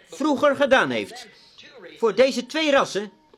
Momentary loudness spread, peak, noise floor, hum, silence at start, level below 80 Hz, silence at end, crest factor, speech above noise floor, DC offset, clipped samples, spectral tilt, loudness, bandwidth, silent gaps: 11 LU; -4 dBFS; -45 dBFS; none; 0.1 s; -62 dBFS; 0.3 s; 18 dB; 24 dB; under 0.1%; under 0.1%; -3.5 dB/octave; -21 LUFS; 13.5 kHz; none